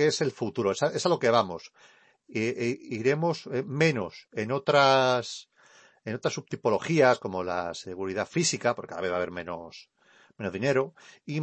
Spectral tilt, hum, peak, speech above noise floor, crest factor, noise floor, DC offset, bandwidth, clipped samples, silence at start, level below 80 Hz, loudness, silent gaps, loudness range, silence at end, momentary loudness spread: -4.5 dB/octave; none; -8 dBFS; 31 dB; 20 dB; -58 dBFS; under 0.1%; 8.8 kHz; under 0.1%; 0 s; -68 dBFS; -27 LUFS; none; 5 LU; 0 s; 15 LU